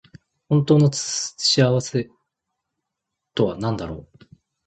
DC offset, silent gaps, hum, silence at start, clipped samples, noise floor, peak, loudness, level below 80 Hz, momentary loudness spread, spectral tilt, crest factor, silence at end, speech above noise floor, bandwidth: under 0.1%; none; none; 0.5 s; under 0.1%; -82 dBFS; -4 dBFS; -20 LUFS; -52 dBFS; 15 LU; -5 dB/octave; 20 dB; 0.65 s; 62 dB; 9.2 kHz